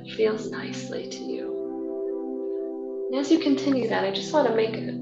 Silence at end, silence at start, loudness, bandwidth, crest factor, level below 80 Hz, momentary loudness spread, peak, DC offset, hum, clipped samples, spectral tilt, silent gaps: 0 s; 0 s; -27 LUFS; 8 kHz; 18 dB; -74 dBFS; 11 LU; -8 dBFS; under 0.1%; none; under 0.1%; -5 dB/octave; none